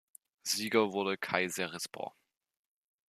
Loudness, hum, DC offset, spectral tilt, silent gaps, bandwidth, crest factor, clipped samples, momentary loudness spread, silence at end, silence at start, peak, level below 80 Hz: -33 LUFS; none; under 0.1%; -3 dB/octave; none; 14.5 kHz; 26 dB; under 0.1%; 13 LU; 1 s; 0.45 s; -10 dBFS; -80 dBFS